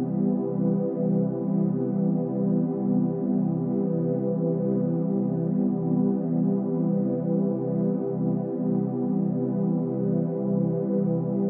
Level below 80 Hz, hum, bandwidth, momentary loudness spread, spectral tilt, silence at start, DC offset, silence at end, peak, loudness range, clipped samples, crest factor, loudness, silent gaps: under -90 dBFS; none; 2.1 kHz; 1 LU; -15 dB/octave; 0 s; under 0.1%; 0 s; -14 dBFS; 1 LU; under 0.1%; 12 dB; -26 LUFS; none